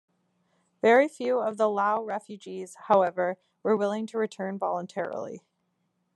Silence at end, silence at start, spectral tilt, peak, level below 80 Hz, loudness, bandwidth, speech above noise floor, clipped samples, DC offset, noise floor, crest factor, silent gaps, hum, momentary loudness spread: 0.8 s; 0.85 s; -5.5 dB/octave; -8 dBFS; -84 dBFS; -27 LUFS; 12 kHz; 49 dB; under 0.1%; under 0.1%; -76 dBFS; 20 dB; none; none; 17 LU